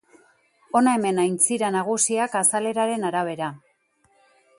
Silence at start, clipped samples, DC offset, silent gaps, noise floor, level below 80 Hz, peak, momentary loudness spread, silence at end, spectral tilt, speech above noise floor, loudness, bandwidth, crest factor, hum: 0.75 s; under 0.1%; under 0.1%; none; -65 dBFS; -74 dBFS; -4 dBFS; 6 LU; 1 s; -3.5 dB/octave; 42 dB; -22 LUFS; 12 kHz; 20 dB; none